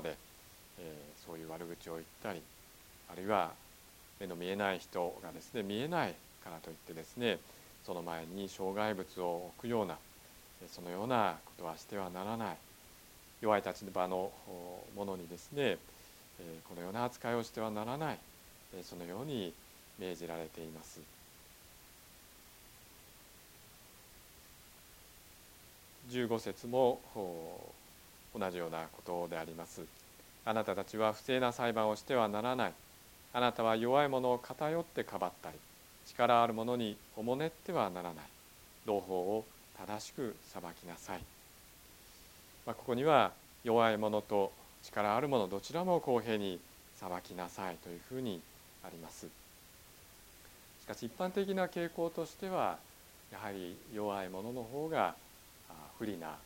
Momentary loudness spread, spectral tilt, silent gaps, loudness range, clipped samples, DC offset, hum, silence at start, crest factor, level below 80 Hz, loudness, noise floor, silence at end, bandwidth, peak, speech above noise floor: 23 LU; -5 dB/octave; none; 13 LU; under 0.1%; under 0.1%; none; 0 s; 26 dB; -68 dBFS; -38 LUFS; -59 dBFS; 0 s; 17.5 kHz; -12 dBFS; 22 dB